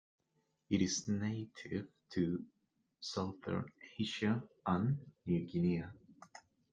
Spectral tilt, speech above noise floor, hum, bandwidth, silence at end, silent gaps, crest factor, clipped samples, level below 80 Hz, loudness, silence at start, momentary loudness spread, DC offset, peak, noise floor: -5.5 dB/octave; 43 dB; none; 9.2 kHz; 0.35 s; none; 20 dB; under 0.1%; -72 dBFS; -39 LUFS; 0.7 s; 14 LU; under 0.1%; -20 dBFS; -81 dBFS